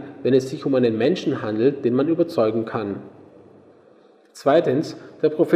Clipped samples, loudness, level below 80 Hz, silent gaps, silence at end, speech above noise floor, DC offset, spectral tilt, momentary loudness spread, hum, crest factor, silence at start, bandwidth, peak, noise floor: under 0.1%; -21 LUFS; -68 dBFS; none; 0 s; 33 dB; under 0.1%; -7 dB/octave; 8 LU; none; 18 dB; 0 s; 12.5 kHz; -4 dBFS; -53 dBFS